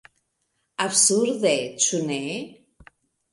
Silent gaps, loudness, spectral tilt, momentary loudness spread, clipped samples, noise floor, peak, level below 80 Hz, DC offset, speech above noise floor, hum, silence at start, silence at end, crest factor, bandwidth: none; -21 LUFS; -2 dB/octave; 16 LU; under 0.1%; -74 dBFS; -4 dBFS; -66 dBFS; under 0.1%; 52 dB; none; 0.8 s; 0.8 s; 22 dB; 11.5 kHz